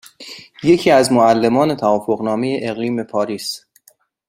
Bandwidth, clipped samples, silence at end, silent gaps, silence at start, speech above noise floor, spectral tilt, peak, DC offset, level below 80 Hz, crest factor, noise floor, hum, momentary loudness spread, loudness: 16 kHz; under 0.1%; 0.7 s; none; 0.2 s; 39 dB; -5 dB/octave; 0 dBFS; under 0.1%; -56 dBFS; 16 dB; -55 dBFS; none; 17 LU; -16 LUFS